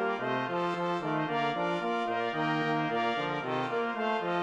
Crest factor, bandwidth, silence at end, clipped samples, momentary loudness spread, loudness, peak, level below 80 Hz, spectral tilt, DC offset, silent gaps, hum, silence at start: 14 dB; 10 kHz; 0 s; under 0.1%; 2 LU; -31 LUFS; -18 dBFS; -76 dBFS; -6 dB/octave; under 0.1%; none; none; 0 s